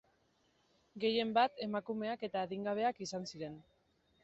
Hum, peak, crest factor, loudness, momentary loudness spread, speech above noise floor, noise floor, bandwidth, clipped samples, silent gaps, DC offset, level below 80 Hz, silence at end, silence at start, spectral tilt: none; -18 dBFS; 20 dB; -37 LUFS; 13 LU; 38 dB; -75 dBFS; 8 kHz; under 0.1%; none; under 0.1%; -78 dBFS; 0.6 s; 0.95 s; -3 dB/octave